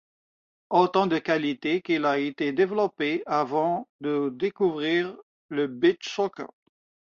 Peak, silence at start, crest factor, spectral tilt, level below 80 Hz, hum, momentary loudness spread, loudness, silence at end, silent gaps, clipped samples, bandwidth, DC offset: -8 dBFS; 0.7 s; 20 dB; -6 dB/octave; -72 dBFS; none; 7 LU; -26 LUFS; 0.7 s; 3.89-3.99 s, 5.23-5.49 s; under 0.1%; 7.2 kHz; under 0.1%